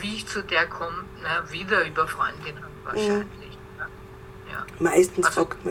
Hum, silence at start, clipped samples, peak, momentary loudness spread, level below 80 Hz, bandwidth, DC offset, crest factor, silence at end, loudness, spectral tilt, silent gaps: none; 0 s; under 0.1%; -6 dBFS; 17 LU; -50 dBFS; 16.5 kHz; under 0.1%; 20 dB; 0 s; -25 LUFS; -4 dB/octave; none